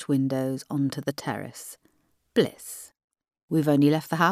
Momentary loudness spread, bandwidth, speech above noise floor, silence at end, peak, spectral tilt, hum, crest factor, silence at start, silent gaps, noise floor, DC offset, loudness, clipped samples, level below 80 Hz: 18 LU; 15.5 kHz; 43 dB; 0 s; -8 dBFS; -6 dB/octave; none; 18 dB; 0 s; 3.04-3.08 s, 3.43-3.48 s; -68 dBFS; under 0.1%; -26 LUFS; under 0.1%; -70 dBFS